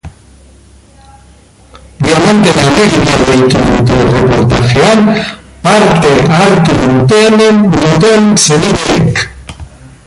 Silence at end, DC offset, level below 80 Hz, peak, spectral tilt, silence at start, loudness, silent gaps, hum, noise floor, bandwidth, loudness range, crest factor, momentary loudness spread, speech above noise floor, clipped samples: 0.4 s; under 0.1%; -28 dBFS; 0 dBFS; -5 dB/octave; 0.05 s; -7 LUFS; none; none; -39 dBFS; 11.5 kHz; 3 LU; 8 dB; 7 LU; 33 dB; under 0.1%